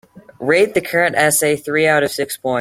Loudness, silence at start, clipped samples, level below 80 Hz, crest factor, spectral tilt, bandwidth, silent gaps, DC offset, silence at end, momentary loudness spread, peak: -16 LUFS; 0.15 s; under 0.1%; -56 dBFS; 16 dB; -3.5 dB/octave; 16.5 kHz; none; under 0.1%; 0 s; 7 LU; -2 dBFS